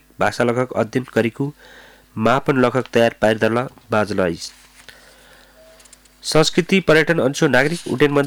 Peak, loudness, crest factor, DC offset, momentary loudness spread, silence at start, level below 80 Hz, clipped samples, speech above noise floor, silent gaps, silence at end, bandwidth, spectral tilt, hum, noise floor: -4 dBFS; -18 LUFS; 14 dB; under 0.1%; 9 LU; 0.2 s; -48 dBFS; under 0.1%; 30 dB; none; 0 s; 19 kHz; -5 dB/octave; none; -48 dBFS